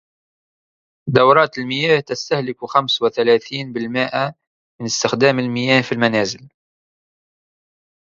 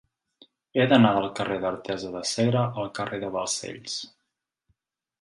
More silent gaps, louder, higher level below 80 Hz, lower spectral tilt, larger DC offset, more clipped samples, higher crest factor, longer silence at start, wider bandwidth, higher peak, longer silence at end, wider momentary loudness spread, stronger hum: first, 4.47-4.79 s vs none; first, -17 LUFS vs -26 LUFS; about the same, -60 dBFS vs -62 dBFS; about the same, -4.5 dB/octave vs -5 dB/octave; neither; neither; about the same, 20 dB vs 22 dB; first, 1.05 s vs 0.75 s; second, 7.6 kHz vs 11.5 kHz; first, 0 dBFS vs -6 dBFS; first, 1.6 s vs 1.15 s; second, 10 LU vs 14 LU; neither